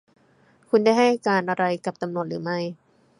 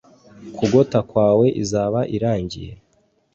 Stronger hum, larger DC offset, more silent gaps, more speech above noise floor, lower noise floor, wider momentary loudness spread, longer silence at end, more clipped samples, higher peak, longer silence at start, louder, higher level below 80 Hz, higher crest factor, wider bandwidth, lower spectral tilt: neither; neither; neither; second, 37 dB vs 44 dB; about the same, -59 dBFS vs -62 dBFS; second, 10 LU vs 17 LU; second, 0.45 s vs 0.6 s; neither; second, -6 dBFS vs -2 dBFS; first, 0.75 s vs 0.4 s; second, -23 LUFS vs -19 LUFS; second, -74 dBFS vs -48 dBFS; about the same, 18 dB vs 18 dB; first, 11 kHz vs 8 kHz; about the same, -6 dB/octave vs -7 dB/octave